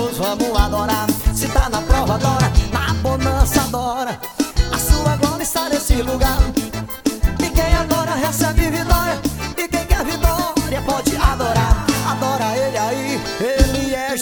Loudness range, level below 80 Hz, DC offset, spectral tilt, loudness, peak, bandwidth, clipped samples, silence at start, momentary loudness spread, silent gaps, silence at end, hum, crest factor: 1 LU; -22 dBFS; under 0.1%; -4.5 dB/octave; -18 LUFS; 0 dBFS; 19.5 kHz; under 0.1%; 0 s; 5 LU; none; 0 s; none; 16 dB